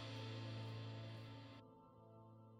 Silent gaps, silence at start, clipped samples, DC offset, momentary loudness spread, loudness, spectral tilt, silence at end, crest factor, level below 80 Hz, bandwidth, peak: none; 0 s; under 0.1%; under 0.1%; 14 LU; -53 LUFS; -6.5 dB/octave; 0 s; 14 dB; -80 dBFS; 9.4 kHz; -40 dBFS